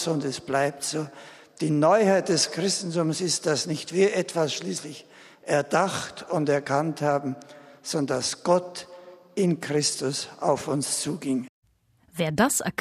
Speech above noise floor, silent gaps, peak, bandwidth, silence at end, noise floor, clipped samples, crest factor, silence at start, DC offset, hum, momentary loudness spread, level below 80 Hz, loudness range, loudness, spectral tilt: 38 dB; 11.49-11.62 s; -8 dBFS; 15 kHz; 0.1 s; -63 dBFS; under 0.1%; 18 dB; 0 s; under 0.1%; none; 14 LU; -66 dBFS; 4 LU; -25 LUFS; -4 dB/octave